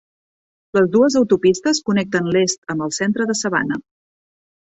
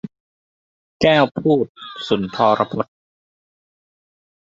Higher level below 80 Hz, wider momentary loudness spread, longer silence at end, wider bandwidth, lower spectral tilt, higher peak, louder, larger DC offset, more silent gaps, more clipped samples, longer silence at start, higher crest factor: about the same, -58 dBFS vs -56 dBFS; second, 8 LU vs 14 LU; second, 1 s vs 1.6 s; about the same, 8.4 kHz vs 7.8 kHz; second, -4.5 dB/octave vs -6.5 dB/octave; about the same, -4 dBFS vs -2 dBFS; about the same, -18 LUFS vs -18 LUFS; neither; second, 2.58-2.62 s vs 0.20-1.00 s, 1.69-1.75 s; neither; first, 0.75 s vs 0.05 s; about the same, 16 dB vs 20 dB